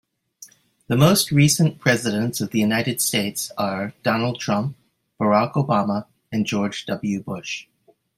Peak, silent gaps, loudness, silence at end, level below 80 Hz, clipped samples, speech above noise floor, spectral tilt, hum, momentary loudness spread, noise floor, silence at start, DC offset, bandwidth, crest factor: -2 dBFS; none; -21 LUFS; 0.55 s; -56 dBFS; under 0.1%; 28 dB; -4.5 dB/octave; none; 12 LU; -48 dBFS; 0.4 s; under 0.1%; 16 kHz; 20 dB